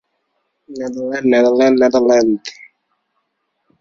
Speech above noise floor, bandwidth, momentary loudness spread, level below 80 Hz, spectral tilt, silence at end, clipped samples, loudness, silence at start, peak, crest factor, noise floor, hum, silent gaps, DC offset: 56 dB; 7.4 kHz; 15 LU; -58 dBFS; -5 dB/octave; 1.3 s; under 0.1%; -14 LUFS; 0.7 s; -2 dBFS; 14 dB; -70 dBFS; none; none; under 0.1%